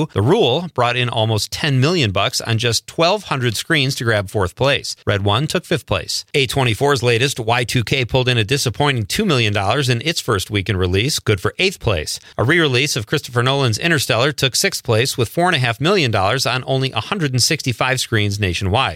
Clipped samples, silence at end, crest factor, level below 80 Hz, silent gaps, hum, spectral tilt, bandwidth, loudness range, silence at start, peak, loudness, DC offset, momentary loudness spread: under 0.1%; 0 s; 14 dB; -46 dBFS; none; none; -4 dB/octave; 16.5 kHz; 1 LU; 0 s; -2 dBFS; -17 LUFS; under 0.1%; 4 LU